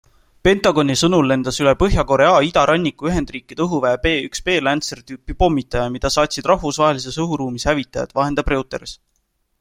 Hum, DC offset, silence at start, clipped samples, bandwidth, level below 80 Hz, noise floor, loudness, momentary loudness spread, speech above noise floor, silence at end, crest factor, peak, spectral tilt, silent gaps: none; under 0.1%; 0.45 s; under 0.1%; 16 kHz; -32 dBFS; -67 dBFS; -18 LUFS; 9 LU; 50 dB; 0.65 s; 18 dB; 0 dBFS; -5 dB/octave; none